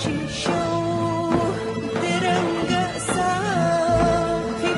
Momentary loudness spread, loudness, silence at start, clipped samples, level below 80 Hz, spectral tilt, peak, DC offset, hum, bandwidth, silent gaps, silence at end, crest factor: 5 LU; -22 LUFS; 0 s; under 0.1%; -42 dBFS; -5 dB/octave; -6 dBFS; under 0.1%; none; 11.5 kHz; none; 0 s; 16 dB